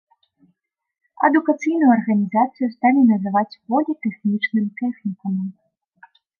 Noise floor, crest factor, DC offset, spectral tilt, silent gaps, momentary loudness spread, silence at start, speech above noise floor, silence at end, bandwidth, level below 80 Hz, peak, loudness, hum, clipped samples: -68 dBFS; 18 dB; under 0.1%; -8 dB/octave; none; 10 LU; 1.2 s; 50 dB; 0.9 s; 7 kHz; -74 dBFS; -2 dBFS; -19 LUFS; none; under 0.1%